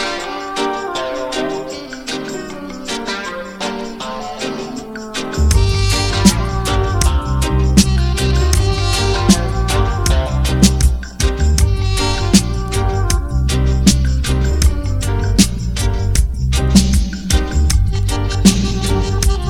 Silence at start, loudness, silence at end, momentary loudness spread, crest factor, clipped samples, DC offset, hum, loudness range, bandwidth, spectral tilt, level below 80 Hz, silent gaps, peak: 0 s; -16 LUFS; 0 s; 11 LU; 14 dB; under 0.1%; under 0.1%; none; 8 LU; 17.5 kHz; -5 dB/octave; -18 dBFS; none; 0 dBFS